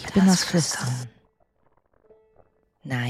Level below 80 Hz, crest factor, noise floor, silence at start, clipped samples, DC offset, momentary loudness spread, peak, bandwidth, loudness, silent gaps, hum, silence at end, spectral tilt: -56 dBFS; 18 dB; -66 dBFS; 0 s; under 0.1%; under 0.1%; 21 LU; -8 dBFS; 14.5 kHz; -22 LUFS; none; none; 0 s; -4.5 dB/octave